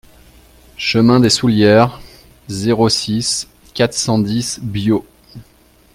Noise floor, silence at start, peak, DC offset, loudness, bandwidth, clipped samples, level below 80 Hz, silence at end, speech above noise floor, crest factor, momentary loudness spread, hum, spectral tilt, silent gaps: -50 dBFS; 0.8 s; 0 dBFS; under 0.1%; -15 LUFS; 15.5 kHz; under 0.1%; -46 dBFS; 0.5 s; 36 dB; 16 dB; 10 LU; none; -4.5 dB/octave; none